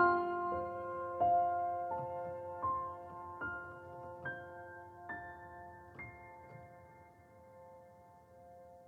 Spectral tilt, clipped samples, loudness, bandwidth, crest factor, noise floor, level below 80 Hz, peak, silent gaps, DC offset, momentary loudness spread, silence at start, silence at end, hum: -8 dB/octave; under 0.1%; -39 LUFS; 4.5 kHz; 22 dB; -60 dBFS; -68 dBFS; -18 dBFS; none; under 0.1%; 26 LU; 0 s; 0 s; none